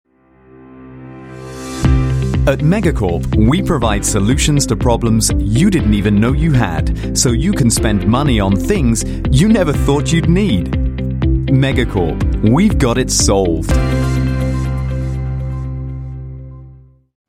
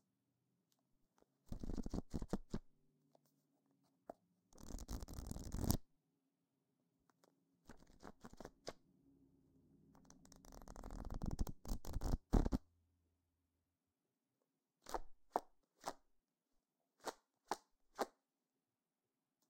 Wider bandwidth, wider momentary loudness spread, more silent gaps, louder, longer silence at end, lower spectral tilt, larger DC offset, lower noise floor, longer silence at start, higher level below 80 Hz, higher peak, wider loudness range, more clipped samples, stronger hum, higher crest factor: about the same, 15.5 kHz vs 16.5 kHz; second, 12 LU vs 20 LU; neither; first, -14 LUFS vs -48 LUFS; second, 0.55 s vs 1.4 s; about the same, -5.5 dB/octave vs -5.5 dB/octave; neither; second, -46 dBFS vs under -90 dBFS; second, 0.75 s vs 1.5 s; first, -22 dBFS vs -52 dBFS; first, 0 dBFS vs -16 dBFS; second, 4 LU vs 15 LU; neither; neither; second, 14 dB vs 34 dB